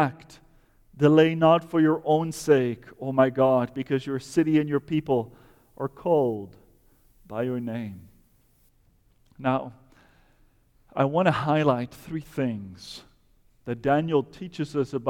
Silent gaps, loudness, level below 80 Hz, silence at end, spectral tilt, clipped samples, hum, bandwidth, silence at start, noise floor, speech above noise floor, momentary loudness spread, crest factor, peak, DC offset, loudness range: none; -25 LUFS; -60 dBFS; 0 s; -7 dB/octave; under 0.1%; none; 15.5 kHz; 0 s; -62 dBFS; 38 dB; 17 LU; 18 dB; -6 dBFS; under 0.1%; 11 LU